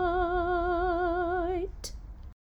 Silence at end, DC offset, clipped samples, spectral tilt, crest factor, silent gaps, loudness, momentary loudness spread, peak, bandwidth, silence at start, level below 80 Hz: 0.1 s; under 0.1%; under 0.1%; -6 dB/octave; 14 dB; none; -29 LUFS; 14 LU; -16 dBFS; 18.5 kHz; 0 s; -40 dBFS